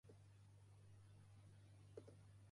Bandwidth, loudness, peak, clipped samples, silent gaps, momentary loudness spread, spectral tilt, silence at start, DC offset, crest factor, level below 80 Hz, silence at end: 11 kHz; -66 LUFS; -44 dBFS; under 0.1%; none; 5 LU; -6.5 dB/octave; 0.05 s; under 0.1%; 22 dB; -80 dBFS; 0 s